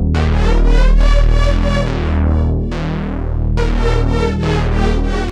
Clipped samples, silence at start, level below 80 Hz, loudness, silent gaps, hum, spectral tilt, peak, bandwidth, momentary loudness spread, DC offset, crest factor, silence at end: under 0.1%; 0 s; -14 dBFS; -16 LUFS; none; none; -7 dB/octave; 0 dBFS; 8.4 kHz; 6 LU; under 0.1%; 12 dB; 0 s